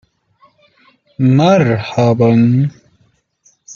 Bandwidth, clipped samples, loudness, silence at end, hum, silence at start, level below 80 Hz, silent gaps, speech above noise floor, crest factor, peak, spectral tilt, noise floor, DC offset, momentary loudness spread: 7.2 kHz; under 0.1%; -12 LUFS; 0 s; none; 1.2 s; -52 dBFS; none; 46 dB; 14 dB; 0 dBFS; -8 dB/octave; -57 dBFS; under 0.1%; 6 LU